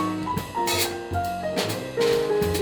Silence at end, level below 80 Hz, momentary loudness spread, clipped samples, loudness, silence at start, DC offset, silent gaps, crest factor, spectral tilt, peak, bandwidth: 0 s; -46 dBFS; 6 LU; under 0.1%; -25 LUFS; 0 s; under 0.1%; none; 16 dB; -4 dB/octave; -8 dBFS; over 20 kHz